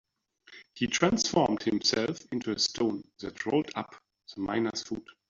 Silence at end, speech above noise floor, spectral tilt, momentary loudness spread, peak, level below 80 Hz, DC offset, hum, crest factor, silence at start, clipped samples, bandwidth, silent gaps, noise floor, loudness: 0.3 s; 30 dB; -3.5 dB/octave; 14 LU; -8 dBFS; -62 dBFS; under 0.1%; none; 24 dB; 0.5 s; under 0.1%; 7.8 kHz; none; -60 dBFS; -29 LUFS